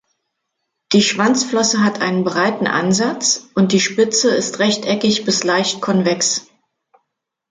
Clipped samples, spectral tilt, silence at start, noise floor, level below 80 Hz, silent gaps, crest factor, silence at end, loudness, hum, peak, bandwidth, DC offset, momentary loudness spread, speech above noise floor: under 0.1%; -3.5 dB/octave; 0.9 s; -76 dBFS; -62 dBFS; none; 16 dB; 1.1 s; -16 LUFS; none; -2 dBFS; 9.6 kHz; under 0.1%; 3 LU; 60 dB